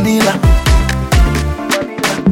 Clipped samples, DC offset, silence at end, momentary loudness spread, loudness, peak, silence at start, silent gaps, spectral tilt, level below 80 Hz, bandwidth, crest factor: under 0.1%; under 0.1%; 0 s; 5 LU; -13 LUFS; 0 dBFS; 0 s; none; -5 dB/octave; -16 dBFS; 17 kHz; 12 dB